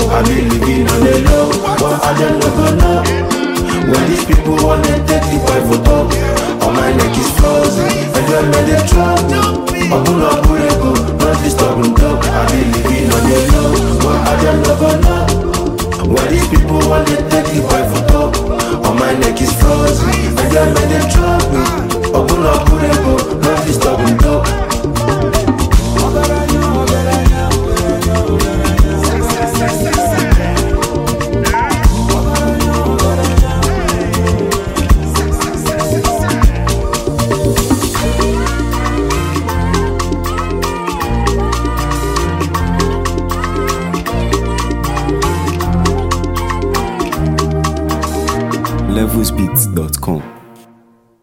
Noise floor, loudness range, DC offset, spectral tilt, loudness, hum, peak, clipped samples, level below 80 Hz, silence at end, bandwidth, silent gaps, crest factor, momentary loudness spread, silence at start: -48 dBFS; 4 LU; under 0.1%; -5.5 dB/octave; -13 LUFS; none; 0 dBFS; under 0.1%; -18 dBFS; 0.85 s; 16.5 kHz; none; 12 dB; 5 LU; 0 s